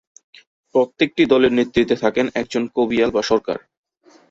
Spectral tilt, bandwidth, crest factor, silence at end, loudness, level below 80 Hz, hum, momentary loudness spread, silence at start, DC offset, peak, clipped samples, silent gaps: -5 dB/octave; 7.8 kHz; 18 dB; 0.7 s; -18 LUFS; -52 dBFS; none; 7 LU; 0.75 s; under 0.1%; -2 dBFS; under 0.1%; none